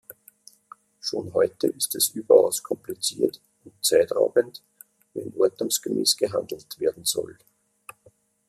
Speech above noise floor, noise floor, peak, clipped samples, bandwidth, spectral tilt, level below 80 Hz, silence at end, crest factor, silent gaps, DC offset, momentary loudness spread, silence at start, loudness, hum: 36 dB; -60 dBFS; -4 dBFS; under 0.1%; 15 kHz; -2.5 dB/octave; -70 dBFS; 1.15 s; 22 dB; none; under 0.1%; 16 LU; 1.05 s; -24 LUFS; none